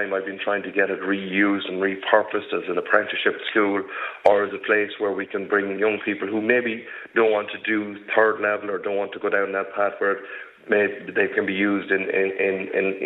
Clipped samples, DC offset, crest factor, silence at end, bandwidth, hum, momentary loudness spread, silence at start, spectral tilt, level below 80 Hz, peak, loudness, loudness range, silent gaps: under 0.1%; under 0.1%; 20 dB; 0 s; 4.9 kHz; none; 6 LU; 0 s; -7.5 dB/octave; -72 dBFS; -2 dBFS; -23 LUFS; 2 LU; none